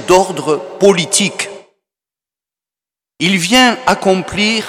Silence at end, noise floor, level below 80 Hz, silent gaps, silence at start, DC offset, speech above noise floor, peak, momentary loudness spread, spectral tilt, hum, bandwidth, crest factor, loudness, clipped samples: 0 s; -89 dBFS; -48 dBFS; none; 0 s; under 0.1%; 77 dB; 0 dBFS; 9 LU; -3 dB/octave; none; 18 kHz; 14 dB; -12 LUFS; 0.1%